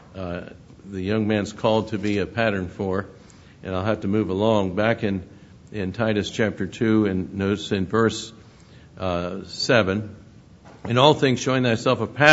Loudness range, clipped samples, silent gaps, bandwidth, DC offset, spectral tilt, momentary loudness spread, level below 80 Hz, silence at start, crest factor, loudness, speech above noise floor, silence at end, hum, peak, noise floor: 3 LU; under 0.1%; none; 8 kHz; under 0.1%; -5.5 dB/octave; 13 LU; -54 dBFS; 0.1 s; 22 dB; -23 LUFS; 26 dB; 0 s; none; 0 dBFS; -48 dBFS